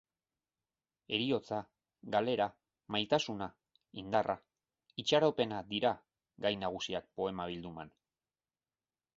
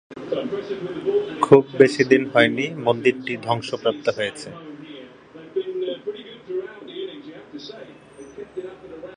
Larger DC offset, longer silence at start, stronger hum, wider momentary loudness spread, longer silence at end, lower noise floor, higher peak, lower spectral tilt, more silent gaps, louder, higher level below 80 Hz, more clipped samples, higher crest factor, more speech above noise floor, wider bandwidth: neither; first, 1.1 s vs 0.1 s; neither; second, 15 LU vs 23 LU; first, 1.3 s vs 0 s; first, under -90 dBFS vs -43 dBFS; second, -14 dBFS vs 0 dBFS; second, -3 dB/octave vs -5.5 dB/octave; neither; second, -35 LUFS vs -21 LUFS; second, -70 dBFS vs -62 dBFS; neither; about the same, 24 dB vs 22 dB; first, over 55 dB vs 24 dB; second, 7.6 kHz vs 10 kHz